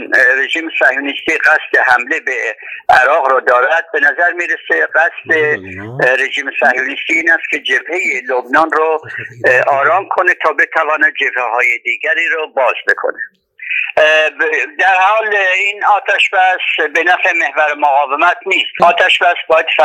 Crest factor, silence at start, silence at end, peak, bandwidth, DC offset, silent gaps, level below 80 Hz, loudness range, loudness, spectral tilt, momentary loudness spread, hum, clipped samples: 12 dB; 0 s; 0 s; 0 dBFS; 14.5 kHz; under 0.1%; none; -60 dBFS; 2 LU; -12 LUFS; -2.5 dB/octave; 6 LU; none; 0.2%